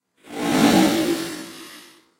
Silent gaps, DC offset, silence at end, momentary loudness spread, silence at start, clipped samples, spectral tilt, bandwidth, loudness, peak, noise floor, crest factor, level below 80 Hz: none; under 0.1%; 0.4 s; 22 LU; 0.3 s; under 0.1%; -4.5 dB/octave; 16 kHz; -19 LUFS; -4 dBFS; -46 dBFS; 18 dB; -54 dBFS